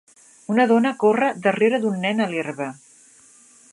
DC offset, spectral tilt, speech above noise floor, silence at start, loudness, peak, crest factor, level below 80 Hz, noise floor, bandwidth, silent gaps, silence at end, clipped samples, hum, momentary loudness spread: under 0.1%; -6 dB/octave; 32 dB; 0.5 s; -20 LUFS; -4 dBFS; 18 dB; -74 dBFS; -51 dBFS; 11.5 kHz; none; 1 s; under 0.1%; none; 12 LU